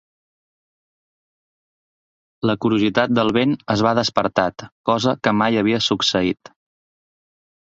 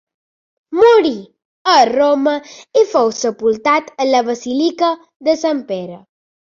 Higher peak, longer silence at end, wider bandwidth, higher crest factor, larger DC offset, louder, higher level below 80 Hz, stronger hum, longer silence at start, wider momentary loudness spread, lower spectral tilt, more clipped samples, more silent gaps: about the same, -2 dBFS vs -2 dBFS; first, 1.3 s vs 0.55 s; about the same, 7.8 kHz vs 7.4 kHz; first, 20 dB vs 14 dB; neither; second, -19 LUFS vs -15 LUFS; first, -54 dBFS vs -60 dBFS; neither; first, 2.45 s vs 0.7 s; second, 6 LU vs 13 LU; first, -5 dB/octave vs -3.5 dB/octave; neither; second, 4.72-4.84 s vs 1.45-1.65 s, 5.16-5.20 s